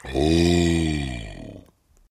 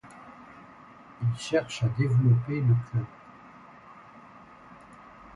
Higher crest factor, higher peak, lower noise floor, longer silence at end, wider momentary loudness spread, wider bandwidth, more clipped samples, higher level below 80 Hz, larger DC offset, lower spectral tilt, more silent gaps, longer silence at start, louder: about the same, 16 dB vs 18 dB; first, -6 dBFS vs -12 dBFS; first, -56 dBFS vs -51 dBFS; about the same, 0.5 s vs 0.4 s; second, 21 LU vs 26 LU; first, 14.5 kHz vs 10.5 kHz; neither; first, -34 dBFS vs -58 dBFS; neither; about the same, -6 dB/octave vs -7 dB/octave; neither; about the same, 0.05 s vs 0.05 s; first, -21 LUFS vs -27 LUFS